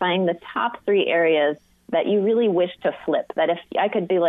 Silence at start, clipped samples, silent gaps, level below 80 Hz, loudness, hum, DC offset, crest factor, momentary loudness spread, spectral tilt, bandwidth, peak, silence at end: 0 s; under 0.1%; none; -68 dBFS; -22 LUFS; none; under 0.1%; 12 dB; 7 LU; -8 dB/octave; 4 kHz; -10 dBFS; 0 s